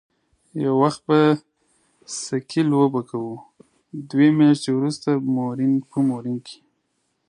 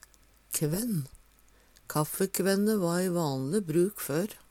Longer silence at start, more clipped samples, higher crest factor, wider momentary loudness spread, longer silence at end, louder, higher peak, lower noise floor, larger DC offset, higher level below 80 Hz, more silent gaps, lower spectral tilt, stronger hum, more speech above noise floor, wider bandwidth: about the same, 0.55 s vs 0.5 s; neither; about the same, 18 dB vs 18 dB; first, 16 LU vs 7 LU; first, 0.75 s vs 0.15 s; first, -21 LUFS vs -29 LUFS; first, -4 dBFS vs -12 dBFS; first, -71 dBFS vs -61 dBFS; neither; second, -68 dBFS vs -62 dBFS; neither; about the same, -6.5 dB/octave vs -5.5 dB/octave; neither; first, 51 dB vs 32 dB; second, 11 kHz vs 17.5 kHz